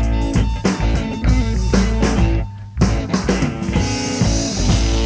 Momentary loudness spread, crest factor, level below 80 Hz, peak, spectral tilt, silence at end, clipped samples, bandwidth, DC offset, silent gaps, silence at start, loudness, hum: 3 LU; 14 dB; -20 dBFS; -2 dBFS; -5.5 dB/octave; 0 s; under 0.1%; 8 kHz; under 0.1%; none; 0 s; -18 LUFS; none